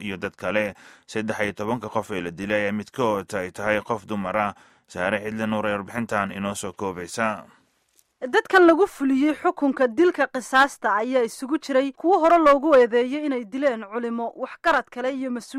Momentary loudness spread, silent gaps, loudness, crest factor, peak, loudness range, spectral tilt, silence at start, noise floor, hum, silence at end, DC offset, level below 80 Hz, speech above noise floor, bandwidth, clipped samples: 13 LU; none; -23 LUFS; 18 dB; -4 dBFS; 7 LU; -5 dB/octave; 0 s; -65 dBFS; none; 0 s; under 0.1%; -60 dBFS; 42 dB; 15 kHz; under 0.1%